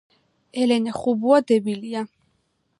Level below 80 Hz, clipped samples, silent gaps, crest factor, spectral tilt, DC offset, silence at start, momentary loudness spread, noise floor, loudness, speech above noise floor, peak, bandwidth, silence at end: -66 dBFS; under 0.1%; none; 18 dB; -5.5 dB/octave; under 0.1%; 0.55 s; 14 LU; -69 dBFS; -21 LUFS; 49 dB; -4 dBFS; 11 kHz; 0.75 s